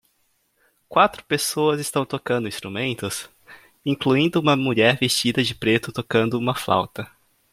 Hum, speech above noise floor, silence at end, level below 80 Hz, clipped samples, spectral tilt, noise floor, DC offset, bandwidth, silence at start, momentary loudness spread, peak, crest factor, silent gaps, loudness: none; 46 dB; 0.45 s; -60 dBFS; under 0.1%; -4.5 dB/octave; -67 dBFS; under 0.1%; 16.5 kHz; 0.9 s; 11 LU; -2 dBFS; 20 dB; none; -21 LUFS